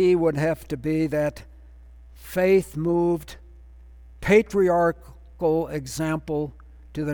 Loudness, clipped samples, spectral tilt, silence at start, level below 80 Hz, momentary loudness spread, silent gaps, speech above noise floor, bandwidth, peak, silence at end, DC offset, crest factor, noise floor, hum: -23 LUFS; under 0.1%; -7 dB/octave; 0 s; -46 dBFS; 12 LU; none; 24 dB; over 20 kHz; -6 dBFS; 0 s; under 0.1%; 18 dB; -46 dBFS; none